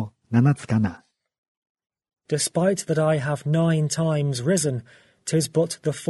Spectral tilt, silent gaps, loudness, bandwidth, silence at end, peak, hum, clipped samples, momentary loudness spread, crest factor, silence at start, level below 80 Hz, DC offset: -5.5 dB/octave; 1.38-1.62 s, 1.69-1.75 s; -23 LUFS; 12 kHz; 0.05 s; -4 dBFS; none; under 0.1%; 6 LU; 18 dB; 0 s; -58 dBFS; under 0.1%